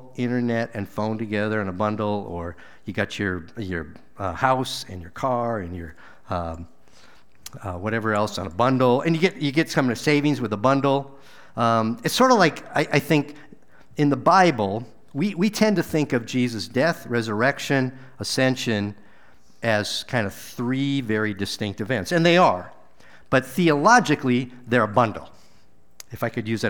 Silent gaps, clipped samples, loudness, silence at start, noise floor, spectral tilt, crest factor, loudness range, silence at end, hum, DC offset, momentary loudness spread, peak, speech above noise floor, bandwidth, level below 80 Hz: none; under 0.1%; -22 LUFS; 0 s; -59 dBFS; -5.5 dB/octave; 20 dB; 7 LU; 0 s; none; 0.6%; 15 LU; -2 dBFS; 37 dB; over 20 kHz; -54 dBFS